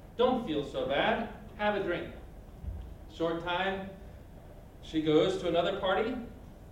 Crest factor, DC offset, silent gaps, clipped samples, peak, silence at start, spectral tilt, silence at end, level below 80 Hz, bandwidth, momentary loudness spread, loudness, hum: 20 dB; under 0.1%; none; under 0.1%; -12 dBFS; 0 s; -6 dB/octave; 0 s; -50 dBFS; 16 kHz; 22 LU; -31 LUFS; none